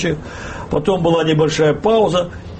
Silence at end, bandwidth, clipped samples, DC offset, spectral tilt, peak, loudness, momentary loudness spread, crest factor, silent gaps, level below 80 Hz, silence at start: 0 s; 8.8 kHz; under 0.1%; under 0.1%; -6 dB/octave; -4 dBFS; -16 LUFS; 11 LU; 14 dB; none; -38 dBFS; 0 s